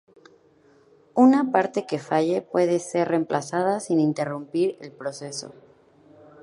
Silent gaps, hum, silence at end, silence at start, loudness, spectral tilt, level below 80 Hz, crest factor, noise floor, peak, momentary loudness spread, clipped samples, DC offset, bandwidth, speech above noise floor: none; none; 0.9 s; 1.15 s; -23 LUFS; -6 dB/octave; -76 dBFS; 20 dB; -57 dBFS; -4 dBFS; 16 LU; under 0.1%; under 0.1%; 11.5 kHz; 35 dB